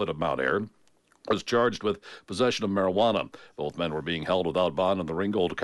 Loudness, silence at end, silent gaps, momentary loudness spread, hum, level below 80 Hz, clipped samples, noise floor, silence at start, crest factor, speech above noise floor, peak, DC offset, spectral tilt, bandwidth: -27 LUFS; 0 s; none; 11 LU; none; -58 dBFS; under 0.1%; -59 dBFS; 0 s; 16 dB; 32 dB; -12 dBFS; under 0.1%; -5.5 dB/octave; 11.5 kHz